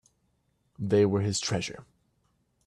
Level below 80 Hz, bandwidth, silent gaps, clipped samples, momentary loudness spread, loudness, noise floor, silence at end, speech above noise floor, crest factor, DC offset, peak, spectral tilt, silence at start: -62 dBFS; 11 kHz; none; under 0.1%; 14 LU; -28 LUFS; -73 dBFS; 0.85 s; 46 dB; 18 dB; under 0.1%; -12 dBFS; -5 dB/octave; 0.8 s